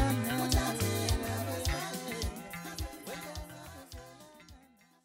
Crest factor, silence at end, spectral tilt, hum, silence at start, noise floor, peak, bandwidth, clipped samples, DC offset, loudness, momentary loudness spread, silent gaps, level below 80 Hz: 18 dB; 0.45 s; -4.5 dB/octave; none; 0 s; -61 dBFS; -16 dBFS; 16 kHz; under 0.1%; under 0.1%; -34 LUFS; 19 LU; none; -42 dBFS